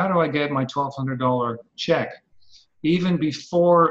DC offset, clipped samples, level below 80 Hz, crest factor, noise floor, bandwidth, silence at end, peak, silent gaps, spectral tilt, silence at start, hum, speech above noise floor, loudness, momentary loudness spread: under 0.1%; under 0.1%; -60 dBFS; 16 dB; -54 dBFS; 7.8 kHz; 0 s; -4 dBFS; none; -7 dB/octave; 0 s; none; 33 dB; -22 LUFS; 8 LU